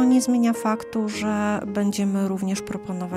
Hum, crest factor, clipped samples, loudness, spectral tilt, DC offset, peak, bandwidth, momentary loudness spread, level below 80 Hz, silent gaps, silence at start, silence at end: none; 14 dB; under 0.1%; -23 LUFS; -5.5 dB/octave; under 0.1%; -10 dBFS; 15 kHz; 8 LU; -58 dBFS; none; 0 s; 0 s